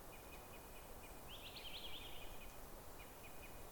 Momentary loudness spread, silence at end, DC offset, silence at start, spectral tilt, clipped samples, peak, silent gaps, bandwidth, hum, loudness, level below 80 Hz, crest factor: 6 LU; 0 s; under 0.1%; 0 s; -3 dB/octave; under 0.1%; -38 dBFS; none; 19 kHz; none; -54 LUFS; -60 dBFS; 14 dB